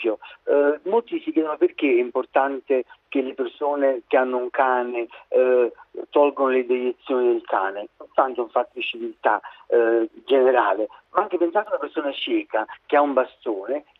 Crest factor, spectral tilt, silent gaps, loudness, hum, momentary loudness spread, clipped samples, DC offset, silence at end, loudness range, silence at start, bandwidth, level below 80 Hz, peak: 18 dB; -7 dB/octave; none; -22 LUFS; none; 8 LU; under 0.1%; under 0.1%; 0.2 s; 2 LU; 0 s; 4.1 kHz; -72 dBFS; -4 dBFS